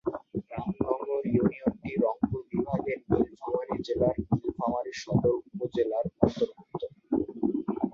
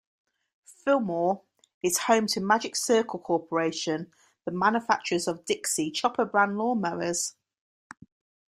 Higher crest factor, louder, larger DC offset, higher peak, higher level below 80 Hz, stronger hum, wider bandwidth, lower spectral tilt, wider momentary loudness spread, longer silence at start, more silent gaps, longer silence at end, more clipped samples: about the same, 24 dB vs 22 dB; second, -30 LUFS vs -27 LUFS; neither; about the same, -6 dBFS vs -6 dBFS; first, -52 dBFS vs -70 dBFS; neither; second, 7.4 kHz vs 16 kHz; first, -8 dB/octave vs -3.5 dB/octave; about the same, 7 LU vs 9 LU; second, 0.05 s vs 0.7 s; second, none vs 1.74-1.81 s; second, 0 s vs 1.2 s; neither